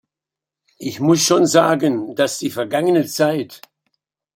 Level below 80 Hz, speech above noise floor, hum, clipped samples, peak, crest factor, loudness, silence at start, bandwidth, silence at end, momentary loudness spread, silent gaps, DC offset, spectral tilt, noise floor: -64 dBFS; 70 dB; none; under 0.1%; -2 dBFS; 18 dB; -17 LUFS; 0.8 s; 16.5 kHz; 0.8 s; 12 LU; none; under 0.1%; -4.5 dB/octave; -87 dBFS